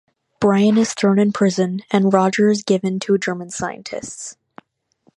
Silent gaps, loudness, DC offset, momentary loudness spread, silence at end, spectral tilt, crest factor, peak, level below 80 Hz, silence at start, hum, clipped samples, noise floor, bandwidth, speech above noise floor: none; -18 LUFS; under 0.1%; 14 LU; 0.85 s; -5.5 dB/octave; 18 dB; 0 dBFS; -60 dBFS; 0.4 s; none; under 0.1%; -61 dBFS; 11 kHz; 43 dB